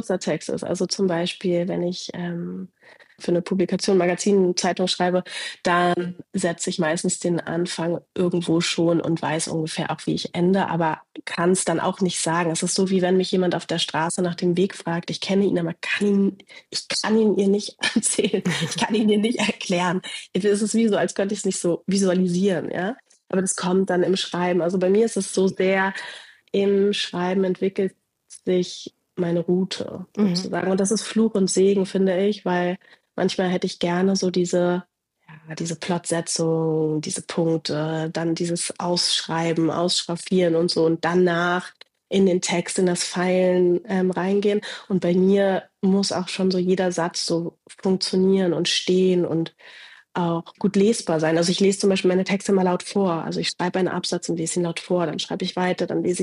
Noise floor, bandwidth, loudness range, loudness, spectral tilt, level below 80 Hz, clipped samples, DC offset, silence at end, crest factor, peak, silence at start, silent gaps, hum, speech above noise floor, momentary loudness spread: -49 dBFS; 11.5 kHz; 3 LU; -22 LUFS; -5 dB/octave; -66 dBFS; under 0.1%; under 0.1%; 0 s; 14 dB; -8 dBFS; 0.05 s; none; none; 28 dB; 8 LU